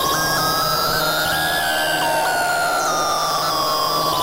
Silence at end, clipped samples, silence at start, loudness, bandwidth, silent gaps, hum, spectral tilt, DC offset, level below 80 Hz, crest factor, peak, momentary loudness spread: 0 s; under 0.1%; 0 s; -18 LUFS; 16 kHz; none; none; -2 dB/octave; under 0.1%; -46 dBFS; 12 dB; -8 dBFS; 1 LU